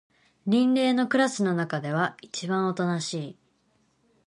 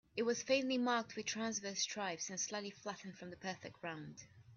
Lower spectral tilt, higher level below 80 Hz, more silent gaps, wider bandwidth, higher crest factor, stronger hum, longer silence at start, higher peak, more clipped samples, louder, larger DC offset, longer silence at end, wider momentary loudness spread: first, -5.5 dB/octave vs -2.5 dB/octave; first, -74 dBFS vs -80 dBFS; neither; first, 11.5 kHz vs 7.6 kHz; about the same, 18 dB vs 20 dB; neither; first, 0.45 s vs 0.15 s; first, -10 dBFS vs -20 dBFS; neither; first, -26 LUFS vs -40 LUFS; neither; first, 0.95 s vs 0 s; about the same, 12 LU vs 14 LU